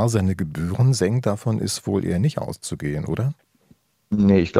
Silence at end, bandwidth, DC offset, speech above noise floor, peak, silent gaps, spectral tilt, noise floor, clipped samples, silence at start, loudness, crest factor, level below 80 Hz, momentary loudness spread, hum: 0 s; 14.5 kHz; under 0.1%; 38 dB; -2 dBFS; none; -6.5 dB/octave; -58 dBFS; under 0.1%; 0 s; -22 LUFS; 20 dB; -50 dBFS; 10 LU; none